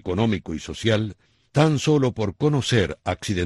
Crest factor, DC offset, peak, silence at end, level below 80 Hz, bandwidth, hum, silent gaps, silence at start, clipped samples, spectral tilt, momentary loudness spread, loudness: 18 dB; under 0.1%; -4 dBFS; 0 s; -48 dBFS; 12 kHz; none; none; 0.05 s; under 0.1%; -6 dB/octave; 8 LU; -23 LUFS